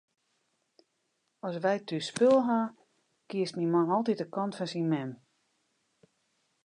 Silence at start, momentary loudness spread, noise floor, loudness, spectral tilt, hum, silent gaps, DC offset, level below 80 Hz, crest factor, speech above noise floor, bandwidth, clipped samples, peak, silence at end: 1.45 s; 14 LU; -78 dBFS; -30 LUFS; -6 dB/octave; none; none; under 0.1%; -84 dBFS; 20 dB; 49 dB; 11 kHz; under 0.1%; -12 dBFS; 1.5 s